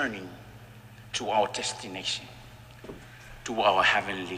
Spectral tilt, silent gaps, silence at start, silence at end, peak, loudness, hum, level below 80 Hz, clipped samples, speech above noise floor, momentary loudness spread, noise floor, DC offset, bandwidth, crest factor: -2.5 dB/octave; none; 0 s; 0 s; -10 dBFS; -27 LUFS; none; -56 dBFS; under 0.1%; 20 dB; 26 LU; -48 dBFS; under 0.1%; 15.5 kHz; 20 dB